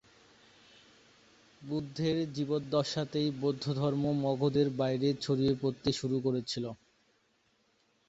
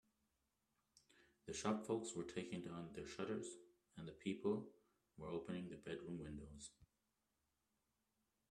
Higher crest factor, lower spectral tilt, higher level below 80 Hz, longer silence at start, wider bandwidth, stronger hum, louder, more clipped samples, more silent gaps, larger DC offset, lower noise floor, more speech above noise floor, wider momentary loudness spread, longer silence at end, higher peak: second, 18 dB vs 24 dB; first, -6.5 dB/octave vs -5 dB/octave; first, -64 dBFS vs -74 dBFS; first, 1.6 s vs 0.95 s; second, 8 kHz vs 12.5 kHz; neither; first, -32 LUFS vs -48 LUFS; neither; neither; neither; second, -72 dBFS vs -88 dBFS; about the same, 41 dB vs 41 dB; second, 8 LU vs 14 LU; second, 1.35 s vs 1.65 s; first, -14 dBFS vs -28 dBFS